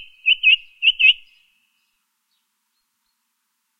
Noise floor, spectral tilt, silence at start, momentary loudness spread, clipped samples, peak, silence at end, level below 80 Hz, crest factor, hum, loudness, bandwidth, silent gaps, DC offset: -73 dBFS; 5 dB/octave; 0 s; 5 LU; under 0.1%; -2 dBFS; 2.65 s; -66 dBFS; 20 dB; none; -14 LUFS; 6.2 kHz; none; under 0.1%